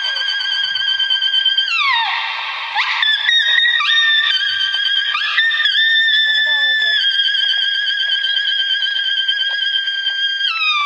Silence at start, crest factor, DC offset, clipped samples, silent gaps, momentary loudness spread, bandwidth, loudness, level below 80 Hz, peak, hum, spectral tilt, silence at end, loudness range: 0 s; 16 dB; under 0.1%; under 0.1%; none; 5 LU; 10 kHz; -13 LUFS; -72 dBFS; -2 dBFS; none; 3.5 dB/octave; 0 s; 2 LU